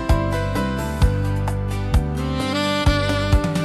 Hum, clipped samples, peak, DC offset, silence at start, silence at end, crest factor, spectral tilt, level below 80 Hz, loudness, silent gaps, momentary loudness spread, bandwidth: none; under 0.1%; -6 dBFS; under 0.1%; 0 s; 0 s; 14 dB; -6 dB/octave; -24 dBFS; -21 LUFS; none; 5 LU; 13 kHz